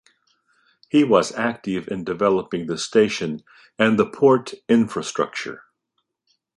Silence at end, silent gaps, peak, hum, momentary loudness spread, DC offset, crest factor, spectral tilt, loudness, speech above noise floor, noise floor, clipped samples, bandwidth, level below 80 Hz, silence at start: 1 s; none; -2 dBFS; none; 11 LU; under 0.1%; 20 dB; -5 dB/octave; -21 LUFS; 55 dB; -75 dBFS; under 0.1%; 11.5 kHz; -62 dBFS; 0.95 s